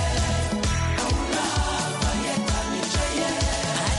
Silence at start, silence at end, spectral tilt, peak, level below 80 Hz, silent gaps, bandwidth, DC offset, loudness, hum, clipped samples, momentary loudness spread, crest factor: 0 s; 0 s; -4 dB/octave; -12 dBFS; -30 dBFS; none; 11.5 kHz; under 0.1%; -24 LUFS; none; under 0.1%; 1 LU; 12 dB